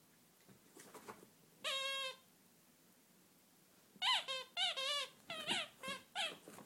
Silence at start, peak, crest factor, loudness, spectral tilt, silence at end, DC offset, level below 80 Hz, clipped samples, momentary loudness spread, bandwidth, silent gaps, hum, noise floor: 0.5 s; -24 dBFS; 22 dB; -40 LUFS; -0.5 dB/octave; 0 s; under 0.1%; under -90 dBFS; under 0.1%; 21 LU; 16.5 kHz; none; none; -69 dBFS